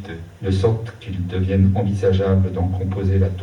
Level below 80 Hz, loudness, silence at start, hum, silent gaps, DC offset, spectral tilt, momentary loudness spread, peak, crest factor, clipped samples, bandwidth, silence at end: -48 dBFS; -20 LUFS; 0 s; none; none; under 0.1%; -9 dB/octave; 11 LU; -4 dBFS; 14 dB; under 0.1%; 6.8 kHz; 0 s